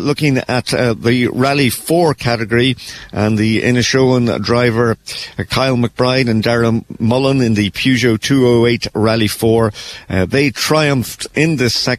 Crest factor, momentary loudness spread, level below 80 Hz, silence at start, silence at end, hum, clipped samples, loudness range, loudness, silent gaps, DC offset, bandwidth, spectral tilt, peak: 12 dB; 6 LU; -42 dBFS; 0 s; 0 s; none; under 0.1%; 1 LU; -14 LUFS; none; under 0.1%; 14 kHz; -5.5 dB/octave; -2 dBFS